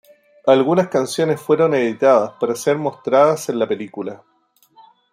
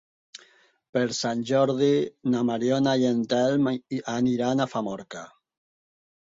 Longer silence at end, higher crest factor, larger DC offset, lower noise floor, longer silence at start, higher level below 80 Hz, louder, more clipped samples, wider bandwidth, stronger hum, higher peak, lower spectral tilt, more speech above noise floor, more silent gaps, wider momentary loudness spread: about the same, 0.95 s vs 1.05 s; about the same, 16 dB vs 16 dB; neither; about the same, -56 dBFS vs -59 dBFS; about the same, 0.45 s vs 0.35 s; about the same, -68 dBFS vs -66 dBFS; first, -17 LUFS vs -25 LUFS; neither; first, 15.5 kHz vs 7.8 kHz; neither; first, -2 dBFS vs -10 dBFS; about the same, -5.5 dB/octave vs -5.5 dB/octave; first, 39 dB vs 35 dB; second, none vs 0.89-0.93 s; about the same, 9 LU vs 9 LU